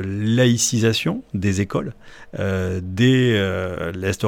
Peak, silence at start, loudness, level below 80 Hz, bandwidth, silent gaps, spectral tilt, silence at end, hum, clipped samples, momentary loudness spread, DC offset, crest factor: -4 dBFS; 0 s; -20 LUFS; -48 dBFS; 17.5 kHz; none; -5 dB/octave; 0 s; none; under 0.1%; 10 LU; under 0.1%; 16 dB